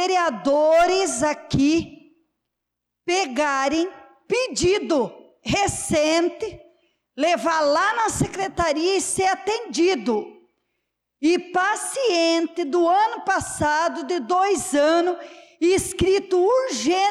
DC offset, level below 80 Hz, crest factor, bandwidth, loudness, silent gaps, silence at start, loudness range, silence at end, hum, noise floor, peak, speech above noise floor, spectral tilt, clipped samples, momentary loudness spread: under 0.1%; -48 dBFS; 10 dB; 14 kHz; -21 LUFS; none; 0 s; 3 LU; 0 s; none; -82 dBFS; -12 dBFS; 61 dB; -3.5 dB/octave; under 0.1%; 7 LU